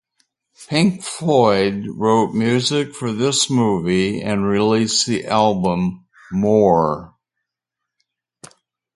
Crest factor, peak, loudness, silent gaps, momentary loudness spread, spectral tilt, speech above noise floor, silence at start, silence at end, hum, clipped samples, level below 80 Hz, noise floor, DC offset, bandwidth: 18 dB; 0 dBFS; -18 LUFS; none; 7 LU; -5 dB/octave; 65 dB; 0.6 s; 0.5 s; none; under 0.1%; -50 dBFS; -82 dBFS; under 0.1%; 11.5 kHz